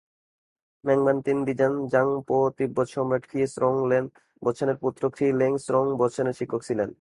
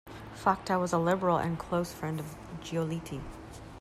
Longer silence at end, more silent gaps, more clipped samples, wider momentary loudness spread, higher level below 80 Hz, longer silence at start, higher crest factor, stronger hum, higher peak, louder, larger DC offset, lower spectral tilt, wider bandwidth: about the same, 0.1 s vs 0 s; neither; neither; second, 6 LU vs 17 LU; second, -64 dBFS vs -54 dBFS; first, 0.85 s vs 0.05 s; about the same, 16 dB vs 20 dB; neither; first, -8 dBFS vs -12 dBFS; first, -25 LUFS vs -31 LUFS; neither; first, -7.5 dB/octave vs -6 dB/octave; second, 11.5 kHz vs 14.5 kHz